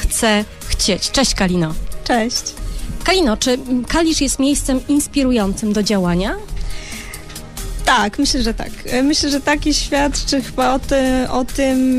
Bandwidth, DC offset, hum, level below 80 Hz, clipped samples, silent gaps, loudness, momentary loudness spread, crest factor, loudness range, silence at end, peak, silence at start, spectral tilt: 15.5 kHz; under 0.1%; none; -28 dBFS; under 0.1%; none; -17 LUFS; 14 LU; 14 dB; 3 LU; 0 s; -4 dBFS; 0 s; -3.5 dB/octave